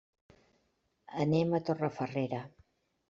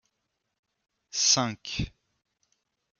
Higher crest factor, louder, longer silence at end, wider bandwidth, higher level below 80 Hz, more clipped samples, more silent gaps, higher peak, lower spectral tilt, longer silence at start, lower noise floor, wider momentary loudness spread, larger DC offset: about the same, 20 dB vs 24 dB; second, -33 LUFS vs -26 LUFS; second, 0.6 s vs 1.1 s; second, 7.6 kHz vs 11.5 kHz; second, -70 dBFS vs -52 dBFS; neither; neither; second, -16 dBFS vs -8 dBFS; first, -7 dB/octave vs -2 dB/octave; about the same, 1.1 s vs 1.15 s; second, -77 dBFS vs -81 dBFS; about the same, 13 LU vs 13 LU; neither